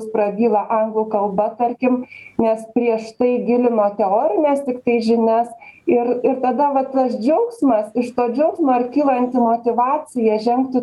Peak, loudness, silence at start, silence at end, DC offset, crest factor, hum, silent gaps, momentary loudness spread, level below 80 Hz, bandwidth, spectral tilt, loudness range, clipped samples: -4 dBFS; -18 LUFS; 0 s; 0 s; under 0.1%; 14 dB; none; none; 4 LU; -62 dBFS; 11.5 kHz; -7 dB/octave; 1 LU; under 0.1%